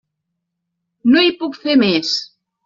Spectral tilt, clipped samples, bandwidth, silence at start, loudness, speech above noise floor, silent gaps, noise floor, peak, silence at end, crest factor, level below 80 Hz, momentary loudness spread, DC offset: -2.5 dB/octave; under 0.1%; 7.6 kHz; 1.05 s; -15 LUFS; 61 dB; none; -76 dBFS; -2 dBFS; 0.4 s; 16 dB; -60 dBFS; 9 LU; under 0.1%